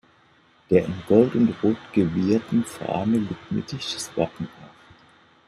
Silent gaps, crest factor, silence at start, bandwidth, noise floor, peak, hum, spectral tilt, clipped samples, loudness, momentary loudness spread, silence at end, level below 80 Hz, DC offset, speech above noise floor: none; 20 dB; 0.7 s; 13.5 kHz; -58 dBFS; -4 dBFS; none; -6.5 dB/octave; under 0.1%; -23 LUFS; 10 LU; 0.8 s; -58 dBFS; under 0.1%; 35 dB